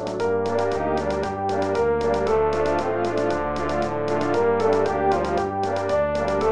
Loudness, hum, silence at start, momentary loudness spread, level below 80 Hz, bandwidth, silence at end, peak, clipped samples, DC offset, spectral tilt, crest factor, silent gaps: -23 LUFS; none; 0 s; 4 LU; -42 dBFS; 10.5 kHz; 0 s; -10 dBFS; under 0.1%; 1%; -6.5 dB/octave; 12 dB; none